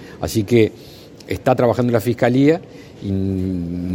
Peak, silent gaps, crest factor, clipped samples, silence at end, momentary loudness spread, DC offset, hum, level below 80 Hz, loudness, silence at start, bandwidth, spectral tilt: 0 dBFS; none; 18 dB; under 0.1%; 0 s; 9 LU; under 0.1%; none; -48 dBFS; -18 LUFS; 0 s; 16.5 kHz; -7 dB/octave